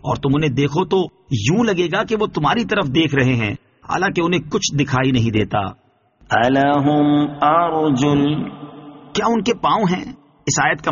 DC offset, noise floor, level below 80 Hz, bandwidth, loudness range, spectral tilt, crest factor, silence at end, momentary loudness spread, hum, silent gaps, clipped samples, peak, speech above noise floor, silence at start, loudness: under 0.1%; -53 dBFS; -46 dBFS; 7.2 kHz; 2 LU; -5 dB/octave; 16 dB; 0 s; 9 LU; none; none; under 0.1%; -2 dBFS; 36 dB; 0.05 s; -18 LUFS